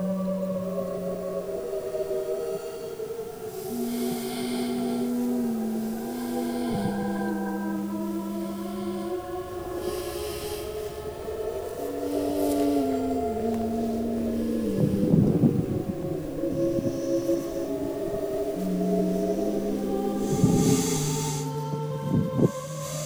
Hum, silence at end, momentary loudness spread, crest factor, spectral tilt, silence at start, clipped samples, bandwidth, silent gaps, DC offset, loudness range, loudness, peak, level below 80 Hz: none; 0 s; 9 LU; 20 dB; -6.5 dB/octave; 0 s; under 0.1%; over 20 kHz; none; under 0.1%; 6 LU; -28 LUFS; -8 dBFS; -48 dBFS